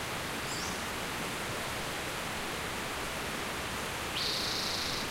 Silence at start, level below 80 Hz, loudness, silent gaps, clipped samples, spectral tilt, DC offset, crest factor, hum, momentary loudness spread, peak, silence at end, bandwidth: 0 s; -52 dBFS; -34 LUFS; none; under 0.1%; -2.5 dB/octave; under 0.1%; 14 dB; none; 4 LU; -22 dBFS; 0 s; 16 kHz